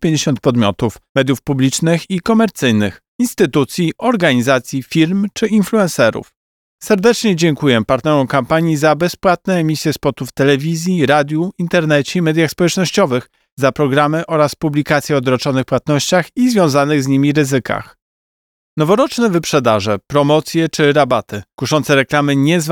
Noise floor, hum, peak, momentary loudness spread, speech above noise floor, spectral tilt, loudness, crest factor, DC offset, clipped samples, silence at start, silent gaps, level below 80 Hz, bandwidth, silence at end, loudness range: under -90 dBFS; none; 0 dBFS; 5 LU; over 76 dB; -5.5 dB/octave; -14 LUFS; 14 dB; under 0.1%; under 0.1%; 0 s; 1.09-1.15 s, 3.08-3.19 s, 6.36-6.78 s, 13.52-13.57 s, 18.02-18.77 s; -48 dBFS; 19 kHz; 0 s; 1 LU